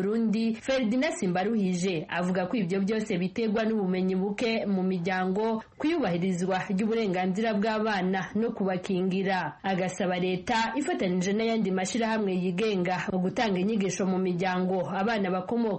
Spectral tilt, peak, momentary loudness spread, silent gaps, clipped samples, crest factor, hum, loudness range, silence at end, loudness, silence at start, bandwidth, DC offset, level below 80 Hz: -6 dB/octave; -14 dBFS; 2 LU; none; under 0.1%; 12 dB; none; 1 LU; 0 s; -28 LUFS; 0 s; 8.8 kHz; under 0.1%; -62 dBFS